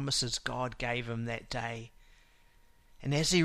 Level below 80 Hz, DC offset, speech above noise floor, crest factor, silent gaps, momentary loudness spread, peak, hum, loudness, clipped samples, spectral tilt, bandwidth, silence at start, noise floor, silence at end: -52 dBFS; under 0.1%; 29 dB; 20 dB; none; 11 LU; -14 dBFS; none; -34 LUFS; under 0.1%; -4 dB/octave; 15.5 kHz; 0 s; -62 dBFS; 0 s